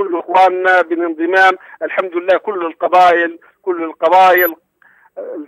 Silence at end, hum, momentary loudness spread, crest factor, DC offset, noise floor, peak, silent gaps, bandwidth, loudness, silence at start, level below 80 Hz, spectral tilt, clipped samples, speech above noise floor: 0 s; none; 12 LU; 12 dB; under 0.1%; -51 dBFS; 0 dBFS; none; 13 kHz; -13 LUFS; 0 s; -64 dBFS; -4 dB/octave; under 0.1%; 38 dB